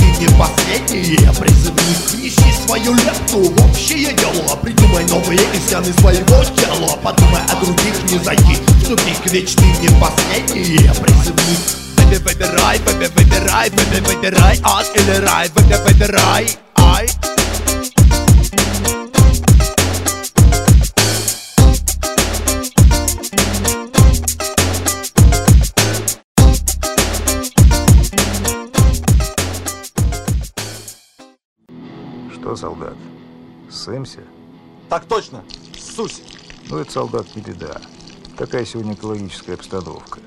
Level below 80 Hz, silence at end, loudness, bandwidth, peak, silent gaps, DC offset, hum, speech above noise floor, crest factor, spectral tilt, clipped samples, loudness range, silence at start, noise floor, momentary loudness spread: -18 dBFS; 0.1 s; -13 LUFS; 16.5 kHz; 0 dBFS; 26.24-26.35 s, 31.45-31.56 s; 0.6%; none; 32 dB; 12 dB; -4.5 dB/octave; under 0.1%; 15 LU; 0 s; -45 dBFS; 16 LU